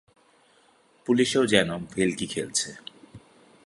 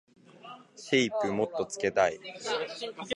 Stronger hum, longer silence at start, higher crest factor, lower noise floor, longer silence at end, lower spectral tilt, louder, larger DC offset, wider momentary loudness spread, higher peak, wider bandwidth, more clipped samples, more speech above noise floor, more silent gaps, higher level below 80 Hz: neither; first, 1.05 s vs 0.35 s; about the same, 26 dB vs 22 dB; first, -61 dBFS vs -50 dBFS; first, 0.5 s vs 0 s; about the same, -3.5 dB/octave vs -3.5 dB/octave; first, -25 LUFS vs -30 LUFS; neither; second, 17 LU vs 20 LU; first, -2 dBFS vs -10 dBFS; about the same, 11.5 kHz vs 11.5 kHz; neither; first, 36 dB vs 20 dB; neither; first, -60 dBFS vs -68 dBFS